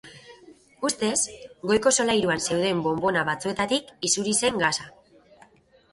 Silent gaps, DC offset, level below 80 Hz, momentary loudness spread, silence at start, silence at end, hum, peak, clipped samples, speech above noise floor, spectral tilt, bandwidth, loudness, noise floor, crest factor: none; under 0.1%; -58 dBFS; 8 LU; 0.05 s; 1.05 s; none; -6 dBFS; under 0.1%; 32 dB; -2.5 dB/octave; 11.5 kHz; -24 LUFS; -57 dBFS; 20 dB